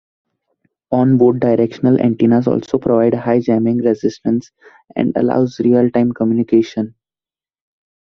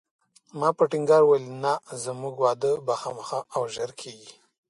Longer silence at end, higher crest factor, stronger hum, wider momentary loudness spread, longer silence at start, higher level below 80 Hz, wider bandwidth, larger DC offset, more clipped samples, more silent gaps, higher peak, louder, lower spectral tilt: first, 1.15 s vs 0.4 s; about the same, 14 dB vs 18 dB; neither; second, 8 LU vs 15 LU; first, 0.9 s vs 0.55 s; first, -54 dBFS vs -74 dBFS; second, 6.4 kHz vs 11.5 kHz; neither; neither; neither; first, -2 dBFS vs -8 dBFS; first, -15 LUFS vs -25 LUFS; first, -9 dB/octave vs -5 dB/octave